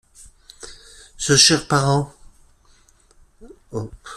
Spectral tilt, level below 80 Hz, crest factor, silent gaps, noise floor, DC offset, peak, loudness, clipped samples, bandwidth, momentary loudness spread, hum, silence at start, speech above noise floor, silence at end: -3 dB/octave; -48 dBFS; 22 dB; none; -54 dBFS; under 0.1%; 0 dBFS; -16 LUFS; under 0.1%; 13.5 kHz; 27 LU; none; 0.65 s; 37 dB; 0 s